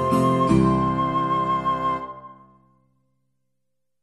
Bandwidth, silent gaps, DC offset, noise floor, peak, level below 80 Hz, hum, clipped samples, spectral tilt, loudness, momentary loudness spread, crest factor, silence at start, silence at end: 13 kHz; none; under 0.1%; -82 dBFS; -6 dBFS; -44 dBFS; none; under 0.1%; -7.5 dB/octave; -21 LUFS; 11 LU; 18 dB; 0 s; 1.7 s